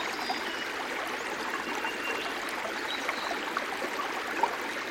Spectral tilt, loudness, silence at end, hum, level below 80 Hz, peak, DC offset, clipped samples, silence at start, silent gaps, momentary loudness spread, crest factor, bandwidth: -1.5 dB/octave; -32 LUFS; 0 s; none; -68 dBFS; -12 dBFS; under 0.1%; under 0.1%; 0 s; none; 3 LU; 20 dB; over 20 kHz